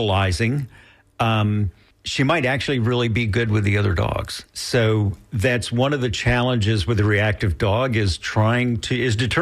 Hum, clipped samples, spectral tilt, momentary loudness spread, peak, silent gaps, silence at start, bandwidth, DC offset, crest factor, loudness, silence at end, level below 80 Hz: none; under 0.1%; -6 dB/octave; 6 LU; -8 dBFS; none; 0 s; 13 kHz; under 0.1%; 12 dB; -21 LUFS; 0 s; -38 dBFS